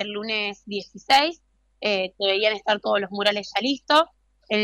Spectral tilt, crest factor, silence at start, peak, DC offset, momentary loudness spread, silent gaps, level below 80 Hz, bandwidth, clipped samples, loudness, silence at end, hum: -3 dB/octave; 18 dB; 0 s; -6 dBFS; under 0.1%; 10 LU; none; -64 dBFS; 16 kHz; under 0.1%; -23 LUFS; 0 s; none